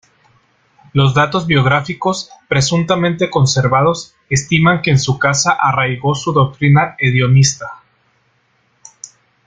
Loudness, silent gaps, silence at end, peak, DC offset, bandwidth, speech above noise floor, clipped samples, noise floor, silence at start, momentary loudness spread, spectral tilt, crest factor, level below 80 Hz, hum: -14 LUFS; none; 0.4 s; 0 dBFS; under 0.1%; 9.2 kHz; 46 dB; under 0.1%; -59 dBFS; 0.95 s; 7 LU; -5 dB/octave; 14 dB; -46 dBFS; none